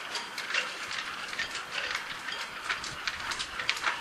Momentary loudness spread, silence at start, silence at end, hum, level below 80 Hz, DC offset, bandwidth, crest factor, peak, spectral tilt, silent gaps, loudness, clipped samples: 5 LU; 0 s; 0 s; none; -62 dBFS; under 0.1%; 15.5 kHz; 28 dB; -6 dBFS; 0 dB/octave; none; -33 LUFS; under 0.1%